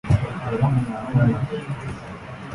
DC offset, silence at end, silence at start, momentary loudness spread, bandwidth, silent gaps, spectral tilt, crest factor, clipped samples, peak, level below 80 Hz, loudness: under 0.1%; 0 s; 0.05 s; 15 LU; 11 kHz; none; -8.5 dB/octave; 16 dB; under 0.1%; -6 dBFS; -38 dBFS; -23 LUFS